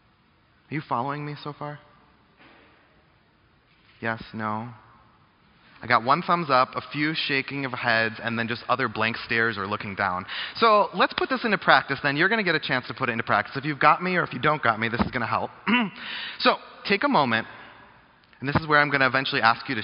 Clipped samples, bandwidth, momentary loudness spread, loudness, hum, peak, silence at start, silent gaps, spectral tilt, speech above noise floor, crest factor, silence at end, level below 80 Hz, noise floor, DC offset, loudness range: under 0.1%; 5.6 kHz; 13 LU; -24 LUFS; none; -2 dBFS; 0.7 s; none; -2.5 dB/octave; 37 dB; 24 dB; 0 s; -58 dBFS; -61 dBFS; under 0.1%; 14 LU